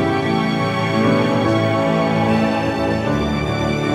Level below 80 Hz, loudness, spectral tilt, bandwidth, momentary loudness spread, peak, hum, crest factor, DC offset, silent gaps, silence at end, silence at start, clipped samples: -38 dBFS; -18 LUFS; -6.5 dB/octave; 14 kHz; 3 LU; -4 dBFS; none; 14 dB; under 0.1%; none; 0 s; 0 s; under 0.1%